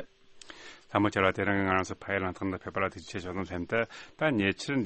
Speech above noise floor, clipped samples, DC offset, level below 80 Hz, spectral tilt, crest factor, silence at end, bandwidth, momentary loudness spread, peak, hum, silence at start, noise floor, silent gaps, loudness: 21 dB; under 0.1%; under 0.1%; -60 dBFS; -5.5 dB/octave; 22 dB; 0 s; 8.4 kHz; 18 LU; -8 dBFS; none; 0 s; -51 dBFS; none; -30 LUFS